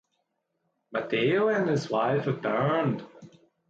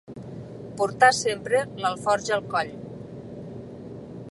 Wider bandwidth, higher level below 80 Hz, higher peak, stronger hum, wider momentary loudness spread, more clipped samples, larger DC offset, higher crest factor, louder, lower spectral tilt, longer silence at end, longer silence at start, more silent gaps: second, 7.8 kHz vs 11.5 kHz; second, -70 dBFS vs -60 dBFS; second, -14 dBFS vs -2 dBFS; neither; second, 9 LU vs 21 LU; neither; neither; second, 14 dB vs 24 dB; second, -27 LUFS vs -24 LUFS; first, -7 dB/octave vs -3.5 dB/octave; first, 0.4 s vs 0 s; first, 0.9 s vs 0.1 s; neither